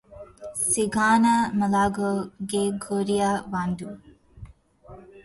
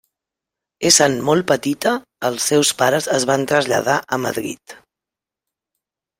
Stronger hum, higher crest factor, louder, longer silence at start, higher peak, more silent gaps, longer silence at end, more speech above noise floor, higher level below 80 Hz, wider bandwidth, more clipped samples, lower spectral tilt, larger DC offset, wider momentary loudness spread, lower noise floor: neither; about the same, 16 dB vs 20 dB; second, -24 LUFS vs -17 LUFS; second, 0.1 s vs 0.8 s; second, -8 dBFS vs 0 dBFS; neither; second, 0.05 s vs 1.45 s; second, 25 dB vs 69 dB; first, -52 dBFS vs -60 dBFS; second, 12 kHz vs 16.5 kHz; neither; first, -4.5 dB/octave vs -3 dB/octave; neither; about the same, 12 LU vs 11 LU; second, -48 dBFS vs -87 dBFS